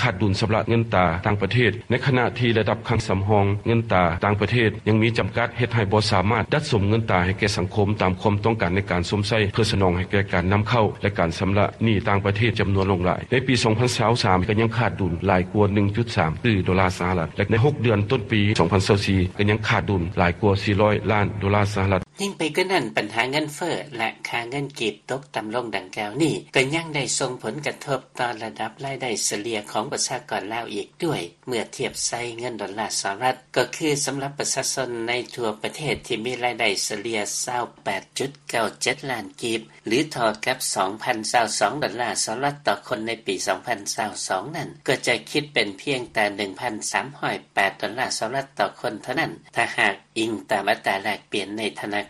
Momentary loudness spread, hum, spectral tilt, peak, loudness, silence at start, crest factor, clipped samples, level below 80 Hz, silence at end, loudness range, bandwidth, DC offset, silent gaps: 8 LU; none; -4.5 dB/octave; -2 dBFS; -23 LUFS; 0 s; 20 dB; under 0.1%; -48 dBFS; 0 s; 5 LU; 13 kHz; under 0.1%; none